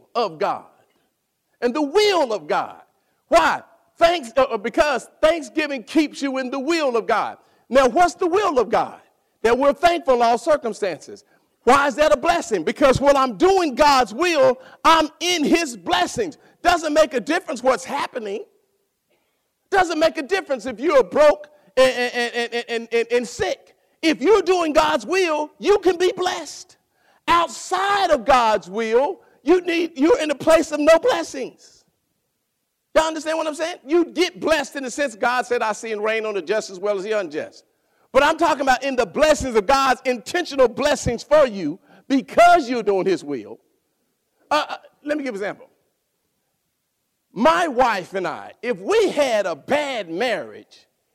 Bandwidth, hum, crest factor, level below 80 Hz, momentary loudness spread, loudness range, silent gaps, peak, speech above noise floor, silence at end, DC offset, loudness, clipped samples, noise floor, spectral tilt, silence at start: 16 kHz; none; 14 dB; -48 dBFS; 11 LU; 6 LU; none; -6 dBFS; 55 dB; 0.55 s; under 0.1%; -19 LUFS; under 0.1%; -74 dBFS; -3.5 dB/octave; 0.15 s